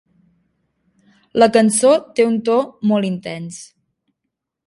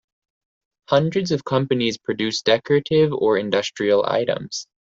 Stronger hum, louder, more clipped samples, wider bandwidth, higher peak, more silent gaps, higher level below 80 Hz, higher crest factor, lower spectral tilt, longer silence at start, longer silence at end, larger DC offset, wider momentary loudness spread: neither; first, -16 LUFS vs -20 LUFS; neither; first, 11.5 kHz vs 7.8 kHz; about the same, 0 dBFS vs -2 dBFS; neither; about the same, -62 dBFS vs -60 dBFS; about the same, 18 dB vs 18 dB; about the same, -4.5 dB/octave vs -5 dB/octave; first, 1.35 s vs 0.9 s; first, 1.05 s vs 0.35 s; neither; first, 16 LU vs 6 LU